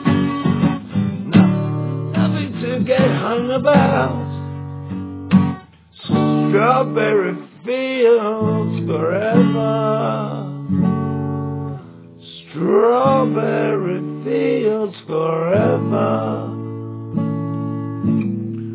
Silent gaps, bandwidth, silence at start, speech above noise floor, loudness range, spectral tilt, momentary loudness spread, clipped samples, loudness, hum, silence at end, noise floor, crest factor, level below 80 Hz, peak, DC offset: none; 4 kHz; 0 s; 24 dB; 3 LU; -12 dB/octave; 13 LU; under 0.1%; -18 LUFS; none; 0 s; -40 dBFS; 18 dB; -46 dBFS; 0 dBFS; under 0.1%